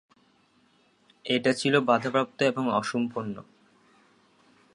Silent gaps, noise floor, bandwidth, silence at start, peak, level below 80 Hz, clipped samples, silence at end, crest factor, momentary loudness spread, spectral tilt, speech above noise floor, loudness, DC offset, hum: none; -64 dBFS; 11 kHz; 1.25 s; -8 dBFS; -74 dBFS; under 0.1%; 1.35 s; 22 dB; 14 LU; -5 dB/octave; 39 dB; -26 LUFS; under 0.1%; none